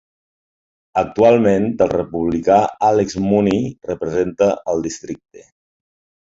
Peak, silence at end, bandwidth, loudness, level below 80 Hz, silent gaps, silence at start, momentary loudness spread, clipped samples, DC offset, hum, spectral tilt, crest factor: -2 dBFS; 0.9 s; 7.8 kHz; -17 LUFS; -48 dBFS; none; 0.95 s; 11 LU; under 0.1%; under 0.1%; none; -6.5 dB/octave; 16 dB